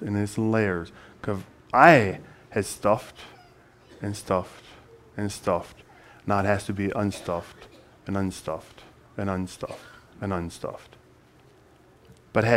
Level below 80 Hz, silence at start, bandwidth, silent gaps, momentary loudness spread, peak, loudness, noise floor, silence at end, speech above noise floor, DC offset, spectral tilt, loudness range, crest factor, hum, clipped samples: -56 dBFS; 0 s; 16 kHz; none; 19 LU; 0 dBFS; -26 LUFS; -56 dBFS; 0 s; 30 dB; under 0.1%; -6 dB/octave; 12 LU; 26 dB; none; under 0.1%